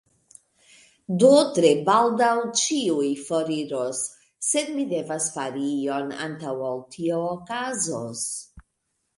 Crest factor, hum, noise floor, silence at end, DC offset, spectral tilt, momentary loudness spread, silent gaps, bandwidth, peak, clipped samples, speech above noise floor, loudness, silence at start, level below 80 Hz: 20 dB; none; -76 dBFS; 0.55 s; under 0.1%; -3.5 dB/octave; 12 LU; none; 11.5 kHz; -4 dBFS; under 0.1%; 53 dB; -24 LUFS; 1.1 s; -66 dBFS